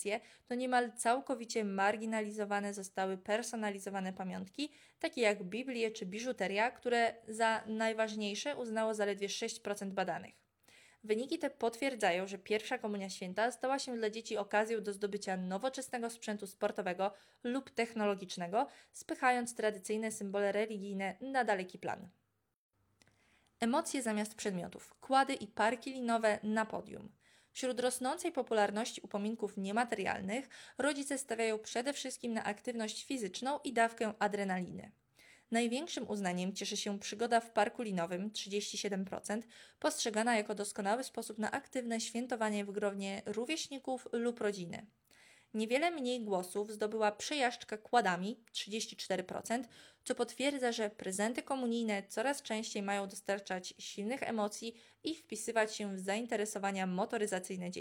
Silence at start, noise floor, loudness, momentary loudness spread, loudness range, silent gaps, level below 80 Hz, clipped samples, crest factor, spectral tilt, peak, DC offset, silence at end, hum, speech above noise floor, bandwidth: 0 s; -72 dBFS; -37 LUFS; 8 LU; 3 LU; 22.56-22.71 s; -82 dBFS; under 0.1%; 20 dB; -3.5 dB/octave; -16 dBFS; under 0.1%; 0 s; none; 35 dB; 18 kHz